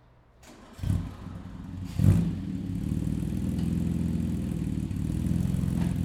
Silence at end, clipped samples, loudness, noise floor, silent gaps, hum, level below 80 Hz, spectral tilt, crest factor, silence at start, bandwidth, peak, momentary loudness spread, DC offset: 0 s; under 0.1%; -29 LUFS; -55 dBFS; none; none; -40 dBFS; -8 dB/octave; 20 dB; 0.45 s; 15 kHz; -8 dBFS; 14 LU; under 0.1%